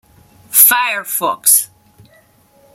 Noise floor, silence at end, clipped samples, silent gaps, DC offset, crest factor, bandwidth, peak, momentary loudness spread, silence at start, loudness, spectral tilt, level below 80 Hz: -51 dBFS; 1.1 s; 0.3%; none; under 0.1%; 16 dB; over 20 kHz; 0 dBFS; 10 LU; 0.5 s; -11 LUFS; 1 dB/octave; -62 dBFS